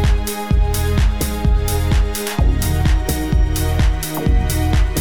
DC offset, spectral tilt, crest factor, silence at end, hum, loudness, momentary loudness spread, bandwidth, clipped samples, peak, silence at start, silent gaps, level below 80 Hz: 2%; -5.5 dB/octave; 12 dB; 0 s; none; -18 LUFS; 2 LU; 18 kHz; under 0.1%; -2 dBFS; 0 s; none; -18 dBFS